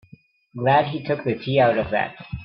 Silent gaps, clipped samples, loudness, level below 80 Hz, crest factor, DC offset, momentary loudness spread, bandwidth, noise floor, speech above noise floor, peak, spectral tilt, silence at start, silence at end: none; under 0.1%; -21 LUFS; -50 dBFS; 18 dB; under 0.1%; 8 LU; 5.6 kHz; -52 dBFS; 31 dB; -4 dBFS; -10 dB/octave; 0.55 s; 0 s